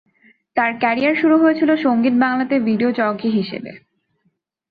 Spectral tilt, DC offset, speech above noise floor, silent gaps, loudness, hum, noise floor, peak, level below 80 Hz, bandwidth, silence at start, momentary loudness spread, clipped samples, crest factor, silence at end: -8.5 dB/octave; under 0.1%; 51 dB; none; -17 LUFS; none; -67 dBFS; -4 dBFS; -64 dBFS; 5 kHz; 0.55 s; 10 LU; under 0.1%; 14 dB; 0.95 s